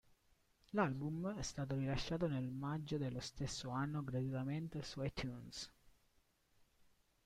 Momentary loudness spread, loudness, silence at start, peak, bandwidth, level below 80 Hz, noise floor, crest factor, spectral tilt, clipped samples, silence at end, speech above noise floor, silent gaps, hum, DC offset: 7 LU; -43 LUFS; 0.75 s; -26 dBFS; 13.5 kHz; -62 dBFS; -76 dBFS; 18 dB; -6 dB/octave; under 0.1%; 1.35 s; 34 dB; none; none; under 0.1%